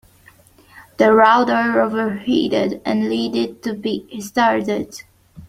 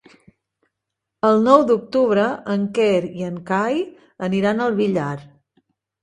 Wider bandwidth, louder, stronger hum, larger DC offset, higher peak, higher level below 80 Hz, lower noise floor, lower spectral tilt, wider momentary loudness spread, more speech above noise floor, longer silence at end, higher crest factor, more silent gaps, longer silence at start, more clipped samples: first, 15.5 kHz vs 10.5 kHz; about the same, -18 LUFS vs -19 LUFS; neither; neither; about the same, 0 dBFS vs 0 dBFS; first, -56 dBFS vs -62 dBFS; second, -50 dBFS vs -81 dBFS; second, -5 dB/octave vs -7 dB/octave; about the same, 13 LU vs 14 LU; second, 33 dB vs 63 dB; second, 0.05 s vs 0.75 s; about the same, 18 dB vs 20 dB; neither; second, 0.75 s vs 1.25 s; neither